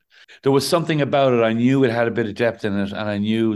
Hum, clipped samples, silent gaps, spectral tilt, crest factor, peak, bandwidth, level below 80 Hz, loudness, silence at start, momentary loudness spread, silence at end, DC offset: none; under 0.1%; none; -6 dB/octave; 14 dB; -4 dBFS; 12.5 kHz; -54 dBFS; -19 LUFS; 0.45 s; 7 LU; 0 s; under 0.1%